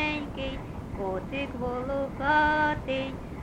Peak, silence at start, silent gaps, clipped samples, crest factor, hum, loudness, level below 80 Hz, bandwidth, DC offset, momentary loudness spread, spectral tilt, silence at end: -12 dBFS; 0 s; none; under 0.1%; 18 dB; none; -29 LUFS; -44 dBFS; 12.5 kHz; under 0.1%; 12 LU; -6.5 dB/octave; 0 s